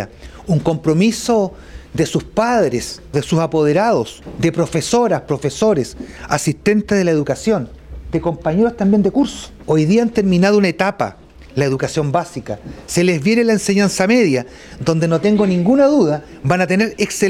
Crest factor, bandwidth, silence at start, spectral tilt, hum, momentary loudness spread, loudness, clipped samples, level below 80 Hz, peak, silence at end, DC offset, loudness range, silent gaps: 16 dB; 15 kHz; 0 s; -6 dB/octave; none; 10 LU; -16 LUFS; under 0.1%; -42 dBFS; 0 dBFS; 0 s; under 0.1%; 3 LU; none